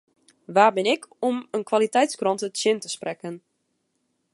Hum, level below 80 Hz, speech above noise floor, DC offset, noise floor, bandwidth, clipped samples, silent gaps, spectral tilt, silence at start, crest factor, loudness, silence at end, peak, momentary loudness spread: none; -82 dBFS; 51 dB; under 0.1%; -74 dBFS; 11.5 kHz; under 0.1%; none; -3.5 dB/octave; 0.5 s; 22 dB; -23 LUFS; 0.95 s; -4 dBFS; 13 LU